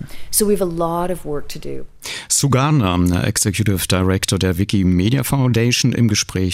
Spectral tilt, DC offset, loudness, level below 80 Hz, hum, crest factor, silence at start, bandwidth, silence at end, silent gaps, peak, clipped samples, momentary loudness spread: -4.5 dB/octave; under 0.1%; -17 LUFS; -38 dBFS; none; 16 dB; 0 s; 16 kHz; 0 s; none; 0 dBFS; under 0.1%; 12 LU